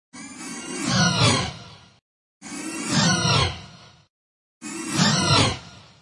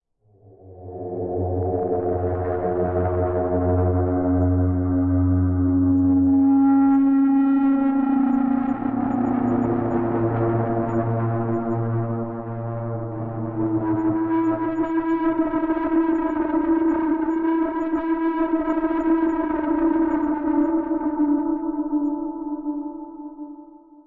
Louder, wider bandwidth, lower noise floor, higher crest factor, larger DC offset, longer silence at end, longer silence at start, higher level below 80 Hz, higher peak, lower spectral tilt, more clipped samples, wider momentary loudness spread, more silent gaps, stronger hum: about the same, -21 LUFS vs -22 LUFS; first, 11.5 kHz vs 3.4 kHz; second, -46 dBFS vs -54 dBFS; first, 18 dB vs 10 dB; neither; about the same, 0.2 s vs 0.3 s; second, 0.15 s vs 0.65 s; about the same, -48 dBFS vs -48 dBFS; first, -6 dBFS vs -10 dBFS; second, -3.5 dB/octave vs -11.5 dB/octave; neither; first, 19 LU vs 11 LU; first, 2.02-2.41 s, 4.10-4.61 s vs none; neither